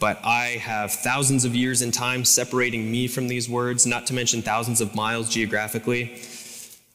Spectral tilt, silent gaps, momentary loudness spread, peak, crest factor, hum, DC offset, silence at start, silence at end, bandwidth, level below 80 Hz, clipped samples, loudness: -3 dB/octave; none; 8 LU; -6 dBFS; 18 dB; none; under 0.1%; 0 s; 0.2 s; 18 kHz; -60 dBFS; under 0.1%; -22 LUFS